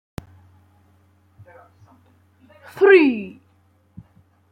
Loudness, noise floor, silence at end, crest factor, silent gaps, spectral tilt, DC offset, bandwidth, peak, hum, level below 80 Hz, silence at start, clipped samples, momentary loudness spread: -15 LUFS; -59 dBFS; 1.2 s; 20 dB; none; -6.5 dB/octave; under 0.1%; 5.2 kHz; -2 dBFS; none; -58 dBFS; 2.75 s; under 0.1%; 27 LU